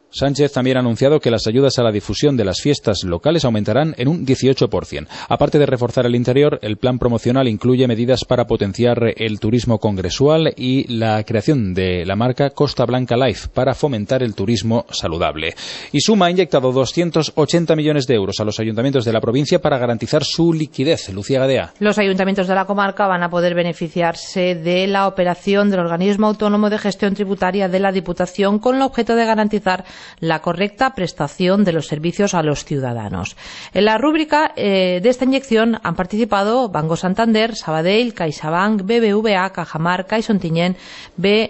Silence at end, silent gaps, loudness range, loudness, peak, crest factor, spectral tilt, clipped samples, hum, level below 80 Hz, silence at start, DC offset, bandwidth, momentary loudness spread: 0 s; none; 2 LU; -17 LUFS; -2 dBFS; 14 dB; -6 dB/octave; under 0.1%; none; -44 dBFS; 0.15 s; under 0.1%; 8.4 kHz; 6 LU